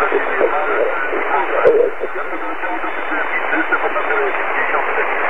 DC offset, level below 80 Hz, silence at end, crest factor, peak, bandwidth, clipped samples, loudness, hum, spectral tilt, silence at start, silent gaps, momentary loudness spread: 7%; -52 dBFS; 0 s; 18 dB; 0 dBFS; 6 kHz; under 0.1%; -17 LUFS; none; -5.5 dB/octave; 0 s; none; 8 LU